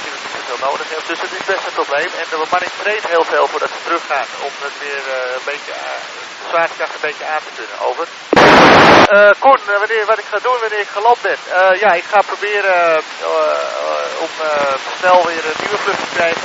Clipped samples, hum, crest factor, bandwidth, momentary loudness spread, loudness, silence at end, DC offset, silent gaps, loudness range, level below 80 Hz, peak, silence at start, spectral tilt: 0.1%; none; 14 dB; 10 kHz; 15 LU; -14 LUFS; 0 s; under 0.1%; none; 11 LU; -50 dBFS; 0 dBFS; 0 s; -3.5 dB/octave